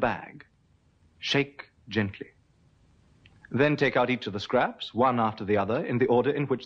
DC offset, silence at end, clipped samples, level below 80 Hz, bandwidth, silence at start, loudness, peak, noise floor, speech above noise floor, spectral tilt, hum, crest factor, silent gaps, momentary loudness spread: under 0.1%; 0 s; under 0.1%; -60 dBFS; 7.8 kHz; 0 s; -27 LUFS; -10 dBFS; -64 dBFS; 38 dB; -6.5 dB/octave; none; 18 dB; none; 13 LU